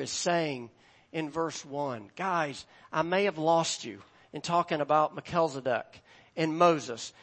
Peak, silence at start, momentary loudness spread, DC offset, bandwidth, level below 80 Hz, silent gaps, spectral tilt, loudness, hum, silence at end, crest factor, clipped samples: -10 dBFS; 0 s; 16 LU; under 0.1%; 8.8 kHz; -72 dBFS; none; -4 dB/octave; -30 LUFS; none; 0.1 s; 20 dB; under 0.1%